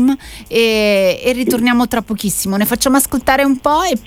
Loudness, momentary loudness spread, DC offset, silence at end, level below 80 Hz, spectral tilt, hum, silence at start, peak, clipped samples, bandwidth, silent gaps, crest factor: -14 LUFS; 5 LU; under 0.1%; 0.05 s; -38 dBFS; -3.5 dB/octave; none; 0 s; 0 dBFS; under 0.1%; 16.5 kHz; none; 14 dB